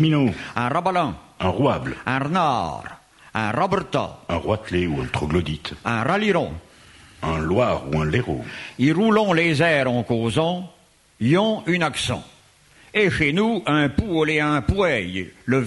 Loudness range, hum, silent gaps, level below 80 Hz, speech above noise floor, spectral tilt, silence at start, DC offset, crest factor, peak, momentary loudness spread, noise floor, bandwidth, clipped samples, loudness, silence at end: 4 LU; none; none; -42 dBFS; 32 dB; -6 dB/octave; 0 s; under 0.1%; 18 dB; -4 dBFS; 11 LU; -53 dBFS; 11.5 kHz; under 0.1%; -22 LUFS; 0 s